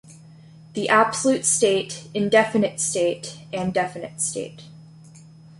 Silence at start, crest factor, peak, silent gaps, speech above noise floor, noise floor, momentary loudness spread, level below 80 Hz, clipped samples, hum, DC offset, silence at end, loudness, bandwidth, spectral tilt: 0.1 s; 20 dB; -4 dBFS; none; 24 dB; -46 dBFS; 14 LU; -62 dBFS; under 0.1%; none; under 0.1%; 0.35 s; -21 LUFS; 11.5 kHz; -3 dB/octave